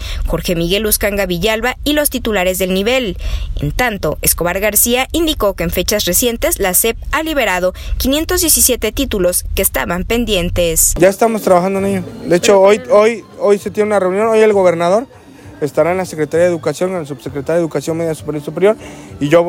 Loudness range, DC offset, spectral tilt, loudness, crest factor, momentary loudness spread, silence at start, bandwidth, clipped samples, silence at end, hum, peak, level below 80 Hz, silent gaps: 4 LU; under 0.1%; -3.5 dB/octave; -14 LUFS; 14 dB; 9 LU; 0 s; 17 kHz; under 0.1%; 0 s; none; 0 dBFS; -28 dBFS; none